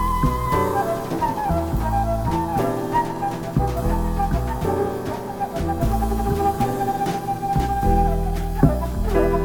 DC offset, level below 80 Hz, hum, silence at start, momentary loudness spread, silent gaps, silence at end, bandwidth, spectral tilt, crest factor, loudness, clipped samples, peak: under 0.1%; -26 dBFS; none; 0 s; 5 LU; none; 0 s; 19.5 kHz; -7 dB/octave; 20 dB; -22 LUFS; under 0.1%; -2 dBFS